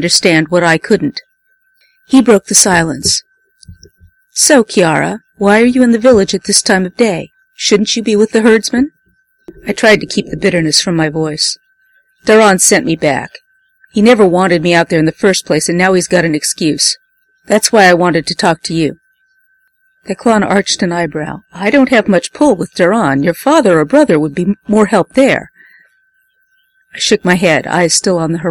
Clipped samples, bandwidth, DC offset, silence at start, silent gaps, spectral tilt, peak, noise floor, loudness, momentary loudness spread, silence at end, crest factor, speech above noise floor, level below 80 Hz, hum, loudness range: 0.1%; over 20 kHz; under 0.1%; 0 s; none; -3.5 dB/octave; 0 dBFS; -57 dBFS; -10 LUFS; 9 LU; 0 s; 12 dB; 47 dB; -46 dBFS; none; 3 LU